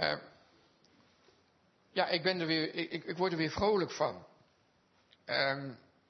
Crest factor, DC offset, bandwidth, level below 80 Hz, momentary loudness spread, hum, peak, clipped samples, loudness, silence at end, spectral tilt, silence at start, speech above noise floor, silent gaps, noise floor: 22 dB; under 0.1%; 6.2 kHz; -66 dBFS; 10 LU; none; -14 dBFS; under 0.1%; -33 LUFS; 0.3 s; -2.5 dB/octave; 0 s; 37 dB; none; -71 dBFS